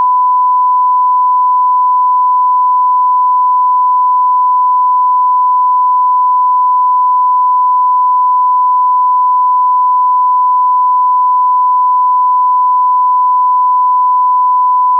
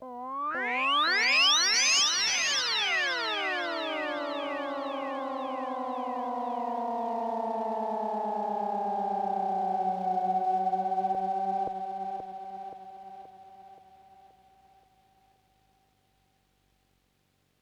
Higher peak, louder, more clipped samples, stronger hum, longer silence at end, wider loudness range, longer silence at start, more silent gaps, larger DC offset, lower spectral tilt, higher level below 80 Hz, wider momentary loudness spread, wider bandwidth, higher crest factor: first, -6 dBFS vs -14 dBFS; first, -9 LUFS vs -28 LUFS; neither; neither; second, 0 s vs 3.8 s; second, 0 LU vs 14 LU; about the same, 0 s vs 0 s; neither; neither; second, 8.5 dB/octave vs -0.5 dB/octave; second, under -90 dBFS vs -76 dBFS; second, 0 LU vs 15 LU; second, 1.1 kHz vs 18 kHz; second, 4 dB vs 18 dB